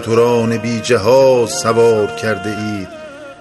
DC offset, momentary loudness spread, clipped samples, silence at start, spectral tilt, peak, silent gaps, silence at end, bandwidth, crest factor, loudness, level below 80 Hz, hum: under 0.1%; 16 LU; under 0.1%; 0 s; -5 dB/octave; 0 dBFS; none; 0.05 s; 12.5 kHz; 14 dB; -14 LUFS; -52 dBFS; none